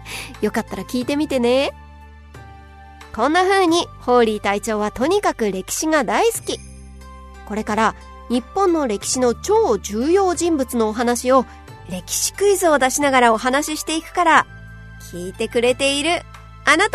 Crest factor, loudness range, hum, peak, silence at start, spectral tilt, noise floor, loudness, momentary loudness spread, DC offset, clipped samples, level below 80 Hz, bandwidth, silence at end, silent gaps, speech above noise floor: 20 dB; 4 LU; none; 0 dBFS; 0 s; -3 dB/octave; -41 dBFS; -18 LUFS; 15 LU; under 0.1%; under 0.1%; -42 dBFS; 13.5 kHz; 0 s; none; 23 dB